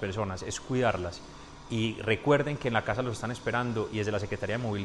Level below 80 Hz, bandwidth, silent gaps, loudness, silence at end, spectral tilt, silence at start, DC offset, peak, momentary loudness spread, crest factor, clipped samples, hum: -52 dBFS; 11.5 kHz; none; -30 LUFS; 0 s; -5.5 dB/octave; 0 s; under 0.1%; -10 dBFS; 10 LU; 20 dB; under 0.1%; none